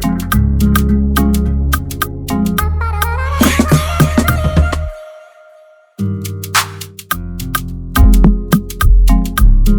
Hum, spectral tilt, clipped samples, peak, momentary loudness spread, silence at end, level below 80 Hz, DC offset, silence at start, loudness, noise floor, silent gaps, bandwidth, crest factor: none; -5.5 dB/octave; 0.2%; 0 dBFS; 10 LU; 0 s; -14 dBFS; under 0.1%; 0 s; -14 LUFS; -44 dBFS; none; over 20 kHz; 12 dB